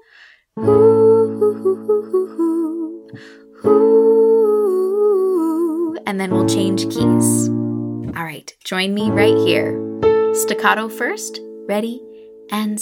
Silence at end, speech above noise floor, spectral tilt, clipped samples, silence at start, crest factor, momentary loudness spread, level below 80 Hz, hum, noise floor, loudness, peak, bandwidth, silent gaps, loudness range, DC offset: 0 s; 31 dB; -5 dB/octave; under 0.1%; 0.55 s; 16 dB; 14 LU; -54 dBFS; none; -48 dBFS; -16 LUFS; 0 dBFS; 16.5 kHz; none; 3 LU; under 0.1%